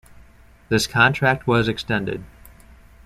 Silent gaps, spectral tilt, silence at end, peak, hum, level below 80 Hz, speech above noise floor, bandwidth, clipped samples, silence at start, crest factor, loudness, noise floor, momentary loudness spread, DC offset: none; -5 dB/octave; 0.8 s; -2 dBFS; none; -46 dBFS; 29 dB; 14.5 kHz; under 0.1%; 0.7 s; 20 dB; -20 LUFS; -49 dBFS; 10 LU; under 0.1%